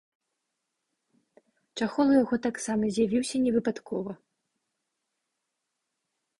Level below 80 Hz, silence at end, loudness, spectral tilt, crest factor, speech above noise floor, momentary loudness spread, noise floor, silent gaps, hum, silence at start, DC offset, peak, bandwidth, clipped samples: -66 dBFS; 2.25 s; -27 LUFS; -5 dB/octave; 20 dB; 57 dB; 13 LU; -83 dBFS; none; none; 1.75 s; under 0.1%; -12 dBFS; 11.5 kHz; under 0.1%